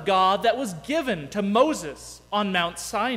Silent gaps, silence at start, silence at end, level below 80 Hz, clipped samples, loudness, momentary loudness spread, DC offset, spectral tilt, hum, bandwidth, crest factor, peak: none; 0 s; 0 s; -56 dBFS; under 0.1%; -24 LUFS; 9 LU; under 0.1%; -4 dB/octave; none; 16 kHz; 16 dB; -8 dBFS